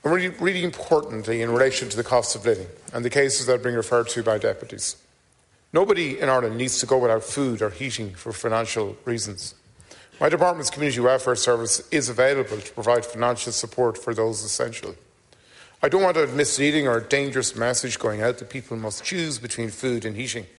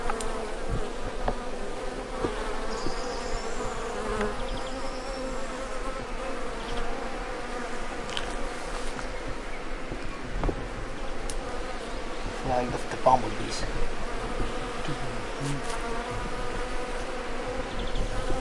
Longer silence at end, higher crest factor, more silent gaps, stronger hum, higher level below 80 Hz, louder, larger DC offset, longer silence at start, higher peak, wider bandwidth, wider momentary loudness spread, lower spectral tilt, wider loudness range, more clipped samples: first, 0.15 s vs 0 s; about the same, 18 dB vs 22 dB; neither; neither; second, -58 dBFS vs -34 dBFS; first, -23 LUFS vs -33 LUFS; neither; about the same, 0.05 s vs 0 s; about the same, -6 dBFS vs -6 dBFS; about the same, 11.5 kHz vs 11.5 kHz; first, 9 LU vs 6 LU; about the same, -3.5 dB/octave vs -4.5 dB/octave; about the same, 4 LU vs 5 LU; neither